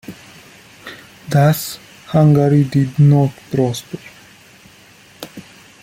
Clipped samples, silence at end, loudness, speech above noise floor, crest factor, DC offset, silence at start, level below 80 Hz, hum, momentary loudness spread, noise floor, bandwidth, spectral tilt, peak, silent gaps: under 0.1%; 0.4 s; -15 LUFS; 32 dB; 16 dB; under 0.1%; 0.1 s; -52 dBFS; none; 23 LU; -45 dBFS; 16 kHz; -7.5 dB/octave; -2 dBFS; none